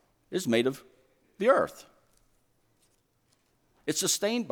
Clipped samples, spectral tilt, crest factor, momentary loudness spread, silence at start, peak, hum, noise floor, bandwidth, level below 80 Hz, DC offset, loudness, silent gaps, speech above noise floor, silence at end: under 0.1%; -3 dB/octave; 22 dB; 12 LU; 0.3 s; -10 dBFS; none; -71 dBFS; 19.5 kHz; -72 dBFS; under 0.1%; -28 LUFS; none; 43 dB; 0 s